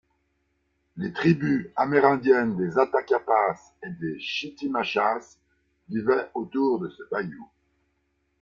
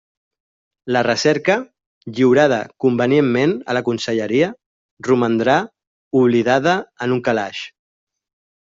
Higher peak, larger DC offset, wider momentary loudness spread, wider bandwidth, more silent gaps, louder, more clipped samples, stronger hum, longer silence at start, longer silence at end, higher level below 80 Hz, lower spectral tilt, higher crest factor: about the same, -4 dBFS vs -2 dBFS; neither; about the same, 13 LU vs 13 LU; about the same, 7.2 kHz vs 7.6 kHz; second, none vs 1.86-2.01 s, 4.66-4.97 s, 5.87-6.11 s; second, -25 LUFS vs -17 LUFS; neither; neither; about the same, 0.95 s vs 0.85 s; about the same, 0.95 s vs 1 s; about the same, -64 dBFS vs -60 dBFS; first, -7 dB/octave vs -5.5 dB/octave; first, 22 dB vs 16 dB